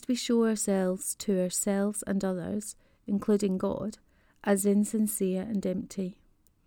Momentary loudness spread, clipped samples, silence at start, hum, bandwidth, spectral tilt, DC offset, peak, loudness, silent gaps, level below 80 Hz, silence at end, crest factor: 10 LU; under 0.1%; 0 s; none; 19.5 kHz; -5 dB/octave; under 0.1%; -12 dBFS; -29 LUFS; none; -62 dBFS; 0.55 s; 18 dB